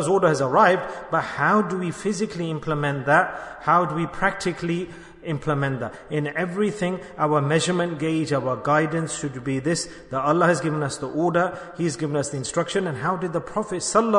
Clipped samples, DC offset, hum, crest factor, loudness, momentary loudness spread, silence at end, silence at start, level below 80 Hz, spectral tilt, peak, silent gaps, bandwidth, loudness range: under 0.1%; under 0.1%; none; 18 dB; -23 LUFS; 8 LU; 0 s; 0 s; -54 dBFS; -5 dB/octave; -4 dBFS; none; 11 kHz; 3 LU